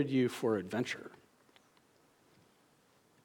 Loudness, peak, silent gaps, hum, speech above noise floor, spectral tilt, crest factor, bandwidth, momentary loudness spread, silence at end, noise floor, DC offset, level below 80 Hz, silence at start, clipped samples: -35 LUFS; -20 dBFS; none; none; 35 dB; -6 dB/octave; 18 dB; 18 kHz; 12 LU; 2.1 s; -69 dBFS; under 0.1%; -84 dBFS; 0 s; under 0.1%